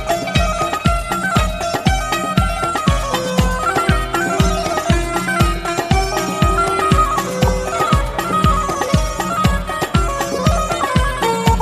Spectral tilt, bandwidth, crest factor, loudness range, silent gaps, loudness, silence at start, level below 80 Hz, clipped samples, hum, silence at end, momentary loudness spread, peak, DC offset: -5 dB/octave; 15 kHz; 16 dB; 1 LU; none; -17 LUFS; 0 s; -24 dBFS; under 0.1%; none; 0 s; 3 LU; 0 dBFS; under 0.1%